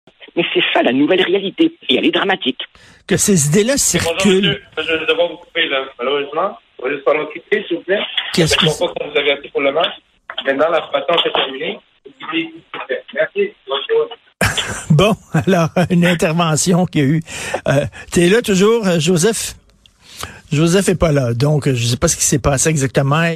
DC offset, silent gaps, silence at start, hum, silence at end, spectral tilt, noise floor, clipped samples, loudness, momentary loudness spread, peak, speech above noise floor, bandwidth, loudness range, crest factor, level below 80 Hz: under 0.1%; none; 0.2 s; none; 0 s; -4 dB/octave; -49 dBFS; under 0.1%; -16 LUFS; 10 LU; -2 dBFS; 33 dB; 15 kHz; 4 LU; 14 dB; -40 dBFS